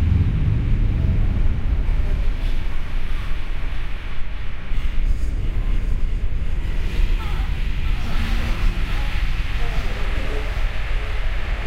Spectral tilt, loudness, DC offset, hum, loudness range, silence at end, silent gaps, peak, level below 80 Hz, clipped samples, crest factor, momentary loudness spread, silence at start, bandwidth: -6.5 dB/octave; -26 LUFS; under 0.1%; none; 5 LU; 0 s; none; -6 dBFS; -20 dBFS; under 0.1%; 12 dB; 9 LU; 0 s; 6.8 kHz